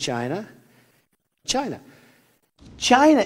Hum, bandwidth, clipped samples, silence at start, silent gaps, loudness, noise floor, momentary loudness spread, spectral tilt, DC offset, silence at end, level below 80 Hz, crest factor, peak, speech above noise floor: none; 15 kHz; under 0.1%; 0 s; none; -22 LUFS; -67 dBFS; 21 LU; -3.5 dB/octave; under 0.1%; 0 s; -56 dBFS; 22 dB; -2 dBFS; 47 dB